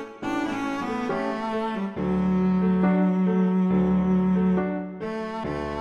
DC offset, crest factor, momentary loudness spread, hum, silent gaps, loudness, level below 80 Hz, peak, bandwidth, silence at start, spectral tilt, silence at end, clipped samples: under 0.1%; 12 dB; 9 LU; none; none; -24 LUFS; -48 dBFS; -12 dBFS; 6.8 kHz; 0 s; -8.5 dB/octave; 0 s; under 0.1%